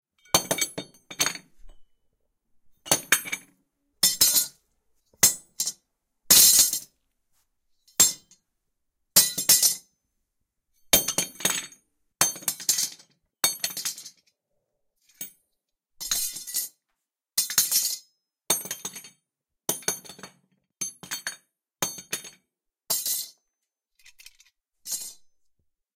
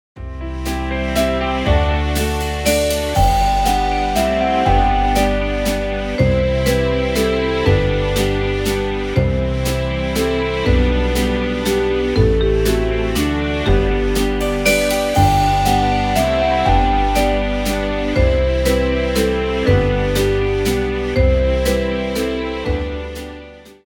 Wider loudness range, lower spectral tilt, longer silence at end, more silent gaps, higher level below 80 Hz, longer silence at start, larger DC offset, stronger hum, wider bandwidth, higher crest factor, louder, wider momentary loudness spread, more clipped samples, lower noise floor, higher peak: first, 13 LU vs 2 LU; second, 0.5 dB/octave vs -5.5 dB/octave; first, 0.85 s vs 0.15 s; neither; second, -60 dBFS vs -22 dBFS; first, 0.35 s vs 0.15 s; neither; neither; second, 17 kHz vs 19.5 kHz; first, 26 dB vs 16 dB; second, -23 LUFS vs -17 LUFS; first, 19 LU vs 5 LU; neither; first, -83 dBFS vs -37 dBFS; about the same, -2 dBFS vs -2 dBFS